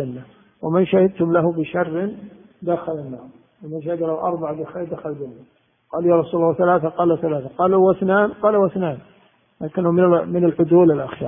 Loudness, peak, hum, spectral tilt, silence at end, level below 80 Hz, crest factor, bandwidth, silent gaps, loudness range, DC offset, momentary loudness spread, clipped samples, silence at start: -19 LUFS; -2 dBFS; none; -13 dB/octave; 0 s; -58 dBFS; 16 dB; 3.7 kHz; none; 9 LU; under 0.1%; 15 LU; under 0.1%; 0 s